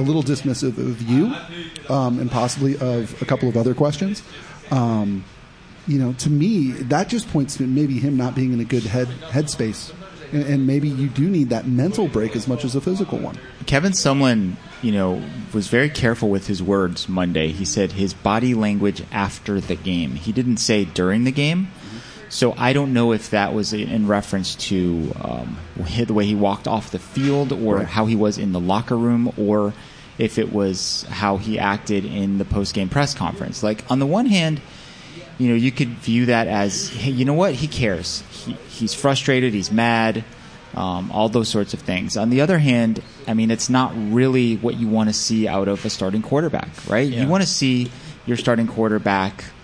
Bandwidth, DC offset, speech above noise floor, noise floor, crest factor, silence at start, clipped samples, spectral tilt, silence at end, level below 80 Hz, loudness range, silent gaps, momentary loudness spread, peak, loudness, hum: 10.5 kHz; under 0.1%; 23 dB; -43 dBFS; 18 dB; 0 s; under 0.1%; -5.5 dB/octave; 0 s; -46 dBFS; 2 LU; none; 9 LU; -2 dBFS; -20 LUFS; none